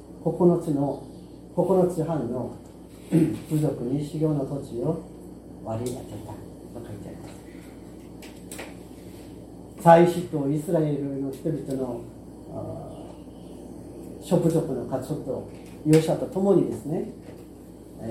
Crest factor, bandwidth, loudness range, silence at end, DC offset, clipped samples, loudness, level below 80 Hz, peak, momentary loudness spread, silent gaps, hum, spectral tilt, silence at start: 24 dB; 16 kHz; 14 LU; 0 s; under 0.1%; under 0.1%; -25 LUFS; -52 dBFS; -2 dBFS; 22 LU; none; none; -7.5 dB/octave; 0 s